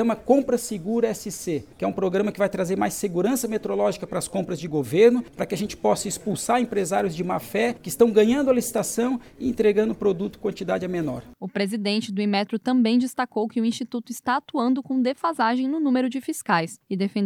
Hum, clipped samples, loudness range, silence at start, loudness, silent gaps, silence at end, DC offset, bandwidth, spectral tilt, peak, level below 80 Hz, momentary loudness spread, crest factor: none; under 0.1%; 3 LU; 0 s; -24 LUFS; none; 0 s; under 0.1%; 18 kHz; -5 dB/octave; -4 dBFS; -56 dBFS; 9 LU; 18 dB